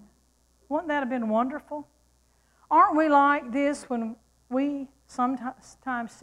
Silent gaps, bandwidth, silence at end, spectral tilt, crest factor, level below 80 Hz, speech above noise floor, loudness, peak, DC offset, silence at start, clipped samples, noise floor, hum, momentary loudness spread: none; 11.5 kHz; 0.15 s; -5 dB/octave; 18 dB; -64 dBFS; 40 dB; -26 LUFS; -8 dBFS; under 0.1%; 0.7 s; under 0.1%; -65 dBFS; none; 17 LU